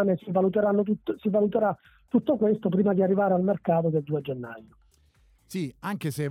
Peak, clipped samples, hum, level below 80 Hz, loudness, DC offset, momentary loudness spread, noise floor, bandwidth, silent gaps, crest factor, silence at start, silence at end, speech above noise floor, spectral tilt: -12 dBFS; under 0.1%; none; -64 dBFS; -26 LUFS; under 0.1%; 12 LU; -62 dBFS; 16 kHz; none; 14 dB; 0 s; 0 s; 36 dB; -8.5 dB/octave